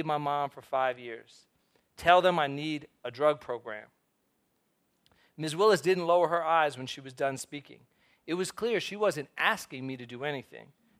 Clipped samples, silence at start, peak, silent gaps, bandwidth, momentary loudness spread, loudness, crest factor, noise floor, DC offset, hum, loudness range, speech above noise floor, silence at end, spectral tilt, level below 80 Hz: under 0.1%; 0 s; -6 dBFS; none; 15.5 kHz; 17 LU; -29 LUFS; 24 dB; -75 dBFS; under 0.1%; none; 4 LU; 45 dB; 0.4 s; -4.5 dB/octave; -68 dBFS